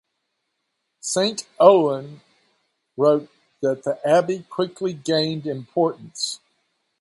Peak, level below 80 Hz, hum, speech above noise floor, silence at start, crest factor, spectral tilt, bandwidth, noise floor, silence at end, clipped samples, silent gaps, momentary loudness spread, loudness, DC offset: 0 dBFS; -72 dBFS; none; 56 dB; 1.05 s; 22 dB; -4.5 dB/octave; 11.5 kHz; -76 dBFS; 0.65 s; under 0.1%; none; 14 LU; -21 LUFS; under 0.1%